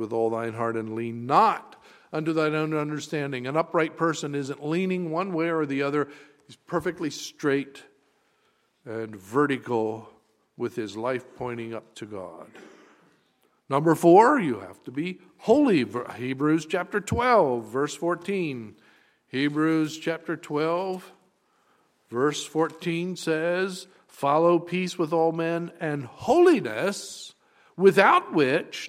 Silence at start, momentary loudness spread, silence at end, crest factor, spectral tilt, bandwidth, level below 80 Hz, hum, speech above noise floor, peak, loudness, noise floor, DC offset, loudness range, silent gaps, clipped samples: 0 s; 15 LU; 0 s; 22 dB; -5.5 dB/octave; 15 kHz; -62 dBFS; none; 43 dB; -4 dBFS; -25 LUFS; -68 dBFS; under 0.1%; 8 LU; none; under 0.1%